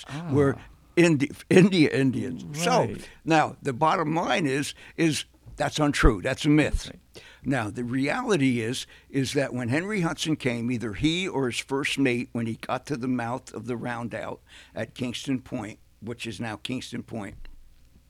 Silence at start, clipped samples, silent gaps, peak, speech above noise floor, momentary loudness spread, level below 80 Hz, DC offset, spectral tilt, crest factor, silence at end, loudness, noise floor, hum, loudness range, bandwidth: 0 s; under 0.1%; none; -4 dBFS; 26 dB; 14 LU; -40 dBFS; under 0.1%; -5.5 dB/octave; 22 dB; 0.5 s; -26 LUFS; -52 dBFS; none; 10 LU; 15 kHz